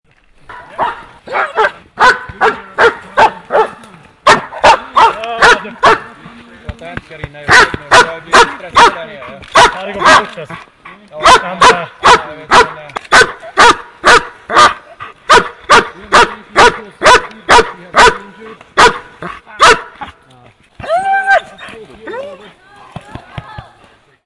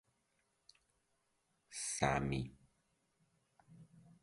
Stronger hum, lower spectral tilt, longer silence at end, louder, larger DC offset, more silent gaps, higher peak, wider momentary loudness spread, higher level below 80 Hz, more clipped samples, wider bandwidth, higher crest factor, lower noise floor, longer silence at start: neither; second, -2 dB/octave vs -4 dB/octave; first, 0.65 s vs 0.2 s; first, -9 LUFS vs -39 LUFS; neither; neither; first, 0 dBFS vs -18 dBFS; first, 21 LU vs 14 LU; first, -36 dBFS vs -62 dBFS; first, 0.6% vs under 0.1%; about the same, 12 kHz vs 11.5 kHz; second, 12 dB vs 28 dB; second, -46 dBFS vs -81 dBFS; second, 0.5 s vs 1.7 s